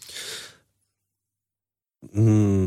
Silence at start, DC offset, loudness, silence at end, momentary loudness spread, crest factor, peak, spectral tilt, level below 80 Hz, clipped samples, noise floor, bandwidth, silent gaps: 0.1 s; under 0.1%; -23 LUFS; 0 s; 19 LU; 14 dB; -10 dBFS; -7 dB/octave; -60 dBFS; under 0.1%; under -90 dBFS; 13.5 kHz; none